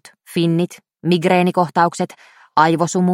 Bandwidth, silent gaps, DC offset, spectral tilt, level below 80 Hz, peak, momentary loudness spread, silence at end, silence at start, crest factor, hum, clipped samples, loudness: 13.5 kHz; none; under 0.1%; -6 dB/octave; -64 dBFS; 0 dBFS; 11 LU; 0 s; 0.3 s; 18 dB; none; under 0.1%; -18 LUFS